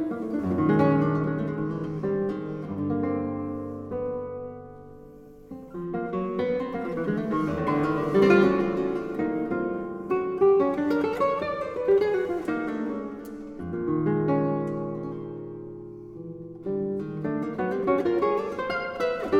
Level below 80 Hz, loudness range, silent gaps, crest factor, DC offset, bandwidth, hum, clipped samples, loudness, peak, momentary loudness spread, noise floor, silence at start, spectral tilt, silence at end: -56 dBFS; 8 LU; none; 18 dB; under 0.1%; 8.4 kHz; none; under 0.1%; -27 LUFS; -8 dBFS; 16 LU; -47 dBFS; 0 s; -8.5 dB/octave; 0 s